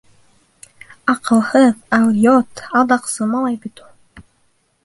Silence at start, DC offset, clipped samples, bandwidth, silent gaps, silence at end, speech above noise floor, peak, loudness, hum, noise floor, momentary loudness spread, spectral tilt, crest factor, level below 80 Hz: 1.05 s; under 0.1%; under 0.1%; 11.5 kHz; none; 0.65 s; 46 dB; -2 dBFS; -15 LUFS; none; -61 dBFS; 10 LU; -5 dB/octave; 16 dB; -58 dBFS